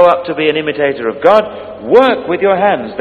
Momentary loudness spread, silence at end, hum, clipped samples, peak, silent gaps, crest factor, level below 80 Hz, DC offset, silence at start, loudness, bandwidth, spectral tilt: 6 LU; 0 s; none; 0.7%; 0 dBFS; none; 12 dB; -50 dBFS; under 0.1%; 0 s; -12 LUFS; 6.8 kHz; -6.5 dB/octave